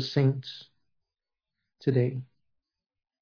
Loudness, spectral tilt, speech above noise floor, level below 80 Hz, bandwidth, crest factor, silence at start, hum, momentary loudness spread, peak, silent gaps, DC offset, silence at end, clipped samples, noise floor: -28 LUFS; -8 dB/octave; 62 dB; -74 dBFS; 5.4 kHz; 20 dB; 0 s; none; 16 LU; -12 dBFS; none; under 0.1%; 0.95 s; under 0.1%; -89 dBFS